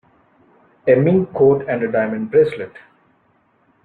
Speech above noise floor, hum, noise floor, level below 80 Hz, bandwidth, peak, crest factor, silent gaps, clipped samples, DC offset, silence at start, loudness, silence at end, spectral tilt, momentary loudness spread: 44 dB; none; -60 dBFS; -58 dBFS; 4.5 kHz; -2 dBFS; 16 dB; none; under 0.1%; under 0.1%; 0.85 s; -17 LUFS; 1.05 s; -10 dB/octave; 10 LU